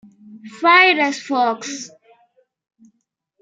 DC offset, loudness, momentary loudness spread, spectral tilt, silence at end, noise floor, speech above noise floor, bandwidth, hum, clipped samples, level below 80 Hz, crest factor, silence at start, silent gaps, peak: under 0.1%; -15 LUFS; 19 LU; -1.5 dB/octave; 1.55 s; -71 dBFS; 54 dB; 9.2 kHz; none; under 0.1%; -82 dBFS; 20 dB; 0.3 s; none; -2 dBFS